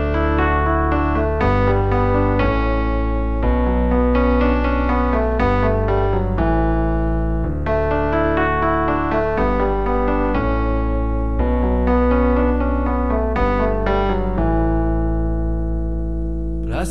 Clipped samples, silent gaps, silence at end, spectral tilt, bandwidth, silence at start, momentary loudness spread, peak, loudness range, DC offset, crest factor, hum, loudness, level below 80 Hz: under 0.1%; none; 0 s; -8.5 dB/octave; 5.8 kHz; 0 s; 5 LU; -4 dBFS; 2 LU; 3%; 12 dB; none; -19 LUFS; -22 dBFS